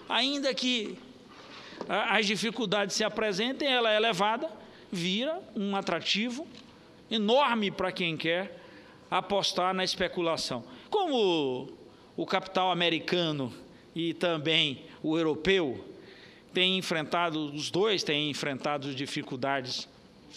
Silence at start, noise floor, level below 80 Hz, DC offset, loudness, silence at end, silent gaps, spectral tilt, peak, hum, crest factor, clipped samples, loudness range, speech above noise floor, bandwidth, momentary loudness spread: 0 s; -52 dBFS; -66 dBFS; under 0.1%; -29 LUFS; 0 s; none; -4 dB/octave; -8 dBFS; none; 22 dB; under 0.1%; 2 LU; 23 dB; 14.5 kHz; 14 LU